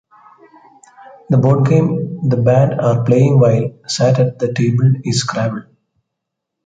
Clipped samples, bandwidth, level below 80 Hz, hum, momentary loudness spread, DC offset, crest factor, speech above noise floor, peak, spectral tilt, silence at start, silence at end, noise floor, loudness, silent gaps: under 0.1%; 9.2 kHz; -52 dBFS; none; 7 LU; under 0.1%; 14 dB; 65 dB; -2 dBFS; -7 dB/octave; 1.3 s; 1.05 s; -78 dBFS; -14 LUFS; none